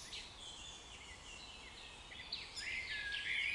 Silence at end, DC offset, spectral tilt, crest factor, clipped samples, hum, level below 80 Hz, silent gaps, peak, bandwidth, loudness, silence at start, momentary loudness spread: 0 s; under 0.1%; -0.5 dB/octave; 18 dB; under 0.1%; none; -64 dBFS; none; -28 dBFS; 11.5 kHz; -45 LUFS; 0 s; 12 LU